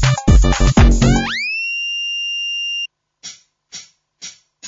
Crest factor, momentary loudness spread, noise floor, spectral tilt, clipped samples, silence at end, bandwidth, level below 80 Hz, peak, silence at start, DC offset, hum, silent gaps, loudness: 16 dB; 22 LU; -39 dBFS; -4.5 dB/octave; under 0.1%; 0 s; 7.8 kHz; -20 dBFS; 0 dBFS; 0 s; under 0.1%; 50 Hz at -40 dBFS; none; -16 LUFS